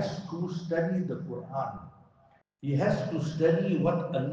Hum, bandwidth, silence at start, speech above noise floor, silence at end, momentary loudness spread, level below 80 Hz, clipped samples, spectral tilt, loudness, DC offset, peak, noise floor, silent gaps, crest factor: none; 7.6 kHz; 0 s; 35 dB; 0 s; 10 LU; -62 dBFS; under 0.1%; -8 dB/octave; -30 LUFS; under 0.1%; -12 dBFS; -64 dBFS; none; 18 dB